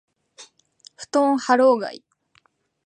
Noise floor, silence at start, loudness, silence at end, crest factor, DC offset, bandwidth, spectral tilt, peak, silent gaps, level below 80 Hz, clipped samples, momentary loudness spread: -63 dBFS; 0.4 s; -19 LUFS; 0.9 s; 20 dB; under 0.1%; 9.8 kHz; -3.5 dB/octave; -4 dBFS; none; -80 dBFS; under 0.1%; 16 LU